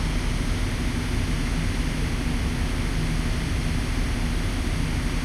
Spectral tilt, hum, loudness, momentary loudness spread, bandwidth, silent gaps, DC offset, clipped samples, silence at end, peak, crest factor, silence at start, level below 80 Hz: -5 dB/octave; none; -27 LUFS; 1 LU; 14 kHz; none; under 0.1%; under 0.1%; 0 s; -12 dBFS; 12 dB; 0 s; -26 dBFS